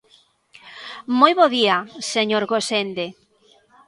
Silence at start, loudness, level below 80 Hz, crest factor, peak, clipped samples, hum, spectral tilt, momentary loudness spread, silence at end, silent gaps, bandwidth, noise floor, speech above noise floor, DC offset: 0.65 s; -19 LUFS; -70 dBFS; 22 dB; 0 dBFS; under 0.1%; none; -3 dB/octave; 18 LU; 0.75 s; none; 11.5 kHz; -57 dBFS; 38 dB; under 0.1%